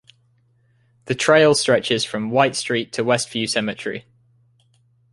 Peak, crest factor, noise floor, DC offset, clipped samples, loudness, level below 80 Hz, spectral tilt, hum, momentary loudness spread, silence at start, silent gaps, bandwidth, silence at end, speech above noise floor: -2 dBFS; 20 dB; -61 dBFS; under 0.1%; under 0.1%; -19 LUFS; -62 dBFS; -3.5 dB/octave; none; 14 LU; 1.05 s; none; 11.5 kHz; 1.15 s; 42 dB